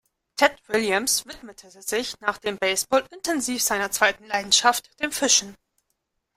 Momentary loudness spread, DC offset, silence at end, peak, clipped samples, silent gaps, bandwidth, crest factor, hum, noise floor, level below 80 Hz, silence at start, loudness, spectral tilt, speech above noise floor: 10 LU; under 0.1%; 0.85 s; -2 dBFS; under 0.1%; none; 16 kHz; 22 dB; none; -76 dBFS; -60 dBFS; 0.35 s; -22 LUFS; -0.5 dB/octave; 52 dB